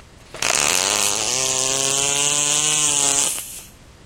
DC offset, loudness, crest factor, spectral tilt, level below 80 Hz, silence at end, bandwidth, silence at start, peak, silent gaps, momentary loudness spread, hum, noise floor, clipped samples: under 0.1%; -17 LUFS; 20 dB; 0 dB/octave; -50 dBFS; 0.35 s; 17 kHz; 0 s; 0 dBFS; none; 8 LU; none; -41 dBFS; under 0.1%